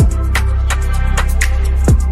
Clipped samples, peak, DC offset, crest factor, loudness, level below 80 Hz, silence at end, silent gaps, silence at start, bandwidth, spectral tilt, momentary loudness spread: under 0.1%; -2 dBFS; under 0.1%; 10 dB; -16 LUFS; -14 dBFS; 0 s; none; 0 s; 14 kHz; -5 dB/octave; 3 LU